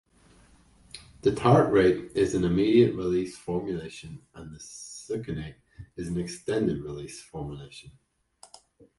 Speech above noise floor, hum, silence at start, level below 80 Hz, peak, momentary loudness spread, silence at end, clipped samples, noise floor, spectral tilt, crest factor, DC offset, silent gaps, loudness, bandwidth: 32 dB; none; 0.95 s; -52 dBFS; -6 dBFS; 24 LU; 1.1 s; under 0.1%; -58 dBFS; -6.5 dB/octave; 22 dB; under 0.1%; none; -26 LUFS; 11.5 kHz